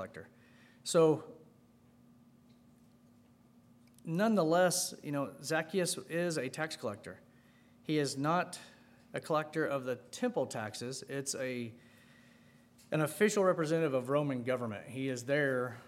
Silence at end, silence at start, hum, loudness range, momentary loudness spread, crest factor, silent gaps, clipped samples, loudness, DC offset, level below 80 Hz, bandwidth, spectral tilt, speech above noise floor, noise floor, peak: 0 s; 0 s; none; 5 LU; 16 LU; 20 dB; none; under 0.1%; -34 LUFS; under 0.1%; -80 dBFS; 16 kHz; -4.5 dB/octave; 30 dB; -64 dBFS; -16 dBFS